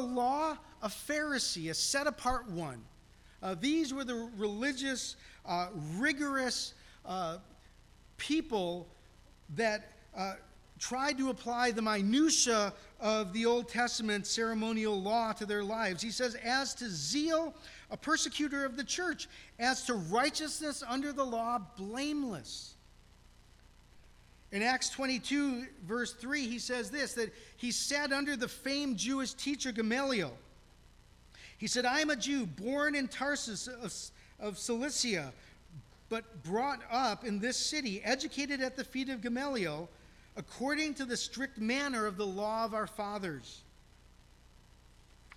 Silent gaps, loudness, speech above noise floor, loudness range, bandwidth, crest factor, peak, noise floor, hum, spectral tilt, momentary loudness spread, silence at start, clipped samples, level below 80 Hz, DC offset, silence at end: none; -34 LUFS; 25 dB; 6 LU; 16 kHz; 18 dB; -16 dBFS; -60 dBFS; 60 Hz at -65 dBFS; -3 dB/octave; 11 LU; 0 s; under 0.1%; -60 dBFS; under 0.1%; 0 s